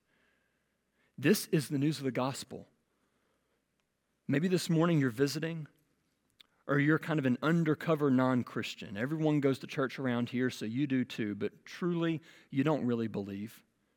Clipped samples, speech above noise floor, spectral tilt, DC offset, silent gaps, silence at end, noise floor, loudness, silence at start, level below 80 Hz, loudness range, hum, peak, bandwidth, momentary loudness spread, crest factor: under 0.1%; 48 dB; -6.5 dB/octave; under 0.1%; none; 0.4 s; -80 dBFS; -32 LUFS; 1.2 s; -78 dBFS; 4 LU; none; -14 dBFS; 17.5 kHz; 12 LU; 18 dB